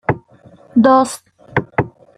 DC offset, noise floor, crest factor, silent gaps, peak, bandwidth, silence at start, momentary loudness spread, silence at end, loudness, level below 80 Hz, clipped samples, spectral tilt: under 0.1%; -45 dBFS; 16 dB; none; -2 dBFS; 14.5 kHz; 0.1 s; 13 LU; 0.3 s; -16 LUFS; -48 dBFS; under 0.1%; -6.5 dB/octave